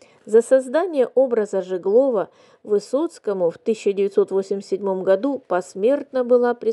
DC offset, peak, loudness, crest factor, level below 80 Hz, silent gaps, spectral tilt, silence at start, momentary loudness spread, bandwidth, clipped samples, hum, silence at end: under 0.1%; -4 dBFS; -20 LUFS; 16 dB; -82 dBFS; none; -6 dB/octave; 0.25 s; 7 LU; 11.5 kHz; under 0.1%; none; 0 s